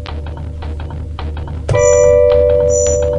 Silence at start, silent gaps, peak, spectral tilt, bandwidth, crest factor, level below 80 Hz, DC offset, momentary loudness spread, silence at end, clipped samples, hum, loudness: 0 s; none; 0 dBFS; -5 dB/octave; 9.6 kHz; 14 dB; -26 dBFS; under 0.1%; 16 LU; 0 s; under 0.1%; none; -11 LUFS